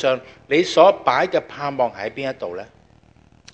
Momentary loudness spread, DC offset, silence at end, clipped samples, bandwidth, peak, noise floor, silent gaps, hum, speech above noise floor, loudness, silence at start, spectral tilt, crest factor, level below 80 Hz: 15 LU; under 0.1%; 0.9 s; under 0.1%; 8.6 kHz; 0 dBFS; -52 dBFS; none; none; 33 dB; -19 LUFS; 0 s; -4.5 dB/octave; 20 dB; -60 dBFS